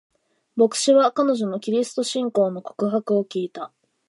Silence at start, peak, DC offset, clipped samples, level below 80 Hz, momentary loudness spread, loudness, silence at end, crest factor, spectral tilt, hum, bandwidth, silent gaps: 0.55 s; -6 dBFS; under 0.1%; under 0.1%; -78 dBFS; 14 LU; -22 LUFS; 0.4 s; 16 dB; -4.5 dB/octave; none; 11.5 kHz; none